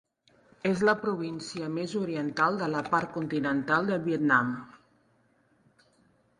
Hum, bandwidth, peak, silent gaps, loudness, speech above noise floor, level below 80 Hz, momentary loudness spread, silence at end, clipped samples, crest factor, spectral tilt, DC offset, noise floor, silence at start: none; 11.5 kHz; -8 dBFS; none; -28 LUFS; 39 dB; -68 dBFS; 9 LU; 1.65 s; under 0.1%; 22 dB; -6 dB/octave; under 0.1%; -67 dBFS; 0.65 s